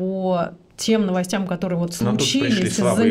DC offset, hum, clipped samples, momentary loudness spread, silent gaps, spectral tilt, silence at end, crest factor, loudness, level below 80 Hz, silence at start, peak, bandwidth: under 0.1%; none; under 0.1%; 6 LU; none; -5 dB/octave; 0 s; 14 dB; -21 LUFS; -52 dBFS; 0 s; -6 dBFS; 16 kHz